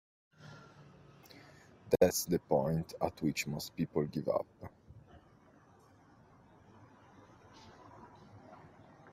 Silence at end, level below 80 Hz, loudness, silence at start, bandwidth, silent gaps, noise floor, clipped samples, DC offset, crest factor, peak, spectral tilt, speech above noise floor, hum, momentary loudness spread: 0 s; -66 dBFS; -34 LUFS; 0.4 s; 16 kHz; none; -63 dBFS; under 0.1%; under 0.1%; 26 dB; -12 dBFS; -5 dB/octave; 29 dB; none; 28 LU